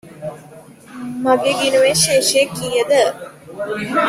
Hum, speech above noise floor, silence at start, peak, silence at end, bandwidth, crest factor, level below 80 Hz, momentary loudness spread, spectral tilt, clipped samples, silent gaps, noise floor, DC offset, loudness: none; 25 dB; 0.05 s; 0 dBFS; 0 s; 15.5 kHz; 18 dB; -54 dBFS; 19 LU; -2.5 dB/octave; under 0.1%; none; -41 dBFS; under 0.1%; -15 LUFS